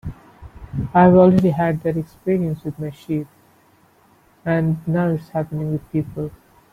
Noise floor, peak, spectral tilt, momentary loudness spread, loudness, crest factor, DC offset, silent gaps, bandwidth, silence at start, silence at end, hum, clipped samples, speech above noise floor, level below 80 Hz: -55 dBFS; -2 dBFS; -10 dB/octave; 18 LU; -19 LUFS; 18 dB; under 0.1%; none; 5 kHz; 0.05 s; 0.4 s; none; under 0.1%; 37 dB; -46 dBFS